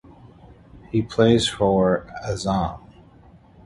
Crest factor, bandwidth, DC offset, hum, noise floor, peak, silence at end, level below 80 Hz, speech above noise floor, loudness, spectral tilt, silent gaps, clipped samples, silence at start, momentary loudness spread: 20 dB; 11.5 kHz; under 0.1%; none; -50 dBFS; -4 dBFS; 0.9 s; -44 dBFS; 29 dB; -21 LUFS; -5.5 dB/octave; none; under 0.1%; 0.75 s; 12 LU